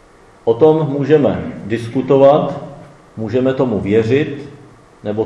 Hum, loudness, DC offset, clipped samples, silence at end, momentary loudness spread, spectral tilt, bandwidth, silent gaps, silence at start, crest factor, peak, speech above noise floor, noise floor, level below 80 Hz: none; -15 LUFS; under 0.1%; under 0.1%; 0 s; 18 LU; -8.5 dB/octave; 11 kHz; none; 0.45 s; 16 dB; 0 dBFS; 23 dB; -37 dBFS; -50 dBFS